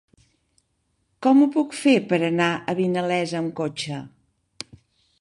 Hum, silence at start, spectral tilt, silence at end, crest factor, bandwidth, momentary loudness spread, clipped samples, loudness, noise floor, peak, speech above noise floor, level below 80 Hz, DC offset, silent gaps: none; 1.2 s; -5.5 dB/octave; 1.15 s; 18 dB; 11.5 kHz; 20 LU; under 0.1%; -22 LUFS; -71 dBFS; -6 dBFS; 50 dB; -66 dBFS; under 0.1%; none